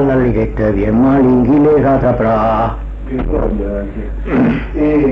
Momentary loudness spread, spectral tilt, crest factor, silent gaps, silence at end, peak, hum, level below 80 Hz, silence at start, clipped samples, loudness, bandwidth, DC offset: 12 LU; -10.5 dB/octave; 10 dB; none; 0 s; -2 dBFS; none; -24 dBFS; 0 s; under 0.1%; -13 LUFS; 5.6 kHz; under 0.1%